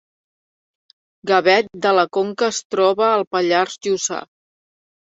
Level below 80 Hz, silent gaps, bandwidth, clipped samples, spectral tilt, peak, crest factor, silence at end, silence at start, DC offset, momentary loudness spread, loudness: -68 dBFS; 2.65-2.70 s, 3.27-3.31 s; 8 kHz; under 0.1%; -3 dB/octave; -2 dBFS; 18 dB; 0.9 s; 1.25 s; under 0.1%; 6 LU; -18 LUFS